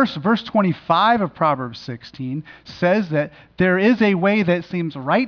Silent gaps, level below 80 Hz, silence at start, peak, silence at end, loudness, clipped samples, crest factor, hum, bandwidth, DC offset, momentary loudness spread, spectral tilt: none; -56 dBFS; 0 s; -6 dBFS; 0 s; -19 LUFS; under 0.1%; 14 dB; none; 5.4 kHz; under 0.1%; 14 LU; -8 dB/octave